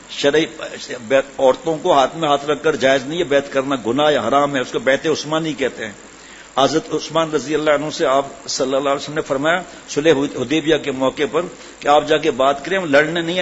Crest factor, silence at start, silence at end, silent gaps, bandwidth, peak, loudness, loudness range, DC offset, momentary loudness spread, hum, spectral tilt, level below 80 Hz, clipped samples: 16 dB; 0 s; 0 s; none; 8 kHz; 0 dBFS; -18 LUFS; 2 LU; under 0.1%; 9 LU; none; -4 dB/octave; -52 dBFS; under 0.1%